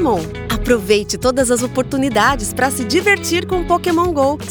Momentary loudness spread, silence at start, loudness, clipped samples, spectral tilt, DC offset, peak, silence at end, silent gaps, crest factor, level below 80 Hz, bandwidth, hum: 4 LU; 0 s; -16 LUFS; under 0.1%; -4 dB/octave; under 0.1%; -2 dBFS; 0 s; none; 14 dB; -32 dBFS; over 20 kHz; none